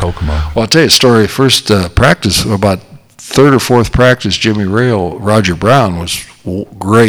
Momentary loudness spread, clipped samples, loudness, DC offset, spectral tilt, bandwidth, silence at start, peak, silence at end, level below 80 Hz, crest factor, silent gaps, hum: 11 LU; 0.9%; -10 LUFS; under 0.1%; -4.5 dB/octave; over 20 kHz; 0 s; 0 dBFS; 0 s; -26 dBFS; 10 dB; none; none